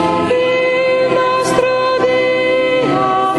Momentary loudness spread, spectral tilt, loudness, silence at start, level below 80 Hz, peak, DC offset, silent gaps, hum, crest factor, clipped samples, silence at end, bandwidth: 1 LU; -4.5 dB/octave; -13 LUFS; 0 s; -48 dBFS; -2 dBFS; under 0.1%; none; none; 12 dB; under 0.1%; 0 s; 12 kHz